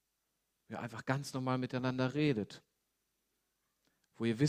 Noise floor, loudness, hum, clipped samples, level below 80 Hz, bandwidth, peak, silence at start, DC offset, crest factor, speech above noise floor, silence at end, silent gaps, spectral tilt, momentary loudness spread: -84 dBFS; -37 LUFS; none; under 0.1%; -74 dBFS; 14.5 kHz; -16 dBFS; 0.7 s; under 0.1%; 22 dB; 48 dB; 0 s; none; -6.5 dB/octave; 13 LU